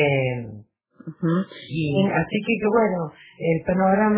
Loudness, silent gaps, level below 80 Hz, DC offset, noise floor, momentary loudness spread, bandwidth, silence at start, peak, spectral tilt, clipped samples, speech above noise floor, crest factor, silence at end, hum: -23 LUFS; none; -52 dBFS; under 0.1%; -46 dBFS; 13 LU; 4 kHz; 0 s; -6 dBFS; -11 dB/octave; under 0.1%; 25 dB; 16 dB; 0 s; none